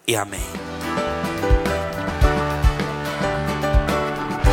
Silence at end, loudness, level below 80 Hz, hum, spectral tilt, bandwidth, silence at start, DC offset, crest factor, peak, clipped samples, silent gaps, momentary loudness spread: 0 s; -22 LUFS; -24 dBFS; none; -5 dB/octave; 17 kHz; 0.05 s; under 0.1%; 18 dB; -2 dBFS; under 0.1%; none; 6 LU